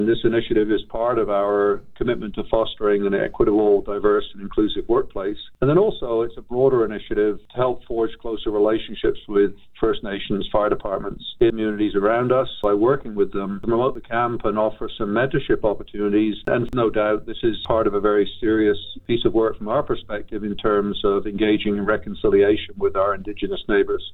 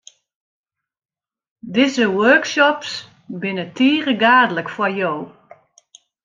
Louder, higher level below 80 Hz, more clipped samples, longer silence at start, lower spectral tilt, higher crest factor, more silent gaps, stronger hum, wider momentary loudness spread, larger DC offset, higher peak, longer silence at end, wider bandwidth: second, -21 LUFS vs -17 LUFS; first, -40 dBFS vs -68 dBFS; neither; second, 0 s vs 1.65 s; first, -9 dB/octave vs -4.5 dB/octave; about the same, 16 dB vs 18 dB; neither; neither; second, 7 LU vs 15 LU; neither; about the same, -4 dBFS vs -2 dBFS; second, 0 s vs 0.95 s; second, 4.2 kHz vs 7.6 kHz